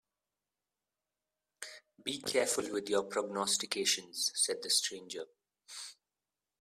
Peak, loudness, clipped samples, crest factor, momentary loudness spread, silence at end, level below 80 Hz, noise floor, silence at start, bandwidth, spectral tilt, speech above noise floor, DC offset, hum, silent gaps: -16 dBFS; -33 LUFS; under 0.1%; 22 dB; 17 LU; 0.7 s; -80 dBFS; under -90 dBFS; 1.6 s; 15.5 kHz; -0.5 dB/octave; over 55 dB; under 0.1%; none; none